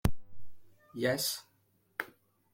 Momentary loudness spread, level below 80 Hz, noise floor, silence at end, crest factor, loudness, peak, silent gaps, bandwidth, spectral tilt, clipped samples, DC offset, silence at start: 15 LU; -48 dBFS; -72 dBFS; 0.45 s; 24 dB; -35 LUFS; -12 dBFS; none; 16.5 kHz; -4 dB/octave; under 0.1%; under 0.1%; 0.05 s